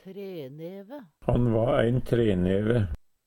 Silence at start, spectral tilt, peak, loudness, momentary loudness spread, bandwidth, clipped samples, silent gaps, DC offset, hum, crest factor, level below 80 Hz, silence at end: 0.05 s; -9 dB/octave; -8 dBFS; -25 LUFS; 16 LU; 16.5 kHz; under 0.1%; none; under 0.1%; none; 18 dB; -40 dBFS; 0.3 s